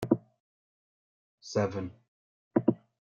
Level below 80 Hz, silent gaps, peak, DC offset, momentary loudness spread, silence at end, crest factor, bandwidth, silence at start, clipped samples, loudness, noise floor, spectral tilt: -70 dBFS; 0.40-1.38 s, 2.08-2.51 s; -10 dBFS; under 0.1%; 13 LU; 0.3 s; 24 dB; 9.4 kHz; 0 s; under 0.1%; -32 LUFS; under -90 dBFS; -7 dB/octave